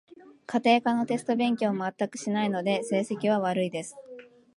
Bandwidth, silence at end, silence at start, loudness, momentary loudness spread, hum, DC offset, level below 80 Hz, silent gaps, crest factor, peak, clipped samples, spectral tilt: 11.5 kHz; 0.3 s; 0.25 s; -27 LUFS; 14 LU; none; under 0.1%; -76 dBFS; none; 20 dB; -8 dBFS; under 0.1%; -5.5 dB/octave